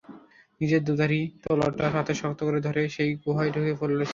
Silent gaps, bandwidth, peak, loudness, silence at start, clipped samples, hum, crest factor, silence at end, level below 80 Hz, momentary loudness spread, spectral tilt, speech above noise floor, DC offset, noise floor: none; 7.4 kHz; -10 dBFS; -26 LUFS; 0.1 s; under 0.1%; none; 16 dB; 0 s; -58 dBFS; 4 LU; -7 dB/octave; 25 dB; under 0.1%; -50 dBFS